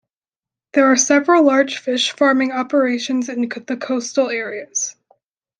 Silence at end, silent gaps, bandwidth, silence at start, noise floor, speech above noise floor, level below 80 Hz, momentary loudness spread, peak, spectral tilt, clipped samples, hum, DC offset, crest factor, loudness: 0.7 s; none; 10.5 kHz; 0.75 s; under -90 dBFS; over 73 dB; -70 dBFS; 11 LU; -2 dBFS; -1.5 dB/octave; under 0.1%; none; under 0.1%; 16 dB; -17 LUFS